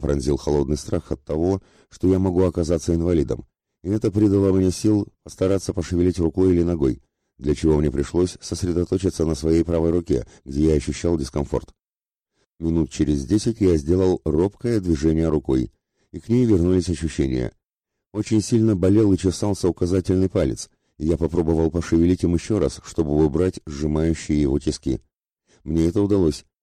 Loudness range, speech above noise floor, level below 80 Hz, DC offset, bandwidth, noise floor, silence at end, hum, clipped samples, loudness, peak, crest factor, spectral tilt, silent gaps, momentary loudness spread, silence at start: 2 LU; over 70 dB; -36 dBFS; under 0.1%; 12 kHz; under -90 dBFS; 0.2 s; none; under 0.1%; -21 LUFS; -8 dBFS; 12 dB; -7 dB/octave; 12.46-12.50 s; 9 LU; 0 s